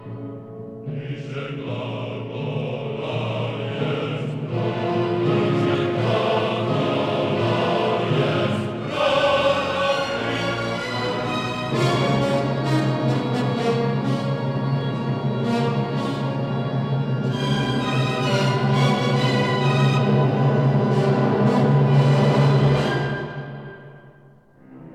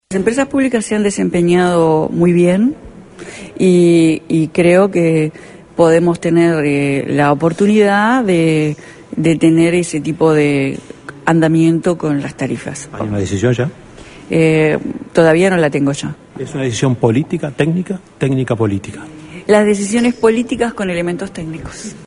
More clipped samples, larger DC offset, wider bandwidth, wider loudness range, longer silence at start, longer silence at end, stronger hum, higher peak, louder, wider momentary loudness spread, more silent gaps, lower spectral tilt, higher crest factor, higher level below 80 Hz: neither; neither; about the same, 10 kHz vs 11 kHz; first, 7 LU vs 4 LU; about the same, 0 s vs 0.1 s; about the same, 0 s vs 0 s; neither; second, -6 dBFS vs 0 dBFS; second, -21 LUFS vs -14 LUFS; second, 11 LU vs 14 LU; neither; about the same, -7 dB/octave vs -6.5 dB/octave; about the same, 14 dB vs 14 dB; second, -52 dBFS vs -46 dBFS